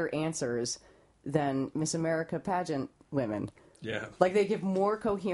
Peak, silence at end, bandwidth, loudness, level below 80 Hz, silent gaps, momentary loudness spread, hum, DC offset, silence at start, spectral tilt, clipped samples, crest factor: -10 dBFS; 0 s; 11.5 kHz; -32 LUFS; -64 dBFS; none; 10 LU; none; under 0.1%; 0 s; -5 dB/octave; under 0.1%; 22 dB